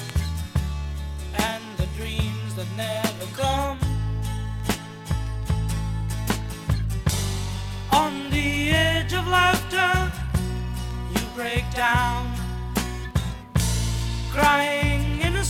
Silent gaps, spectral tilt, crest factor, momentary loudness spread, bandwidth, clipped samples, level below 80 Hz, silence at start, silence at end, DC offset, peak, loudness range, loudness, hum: none; -4.5 dB/octave; 20 dB; 10 LU; 17 kHz; under 0.1%; -30 dBFS; 0 s; 0 s; under 0.1%; -6 dBFS; 6 LU; -25 LUFS; none